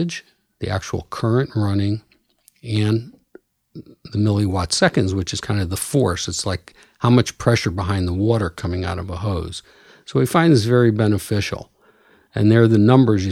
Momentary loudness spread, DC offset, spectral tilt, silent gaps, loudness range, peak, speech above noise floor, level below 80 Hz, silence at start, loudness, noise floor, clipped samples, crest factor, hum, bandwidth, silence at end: 13 LU; under 0.1%; -6 dB/octave; none; 5 LU; 0 dBFS; 39 dB; -44 dBFS; 0 s; -19 LUFS; -58 dBFS; under 0.1%; 18 dB; none; 15 kHz; 0 s